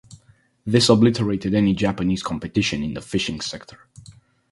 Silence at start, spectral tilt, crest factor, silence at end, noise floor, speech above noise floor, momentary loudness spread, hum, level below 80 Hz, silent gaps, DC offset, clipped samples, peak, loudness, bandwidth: 0.1 s; -5.5 dB/octave; 22 dB; 0.4 s; -57 dBFS; 36 dB; 13 LU; none; -46 dBFS; none; under 0.1%; under 0.1%; 0 dBFS; -21 LUFS; 11.5 kHz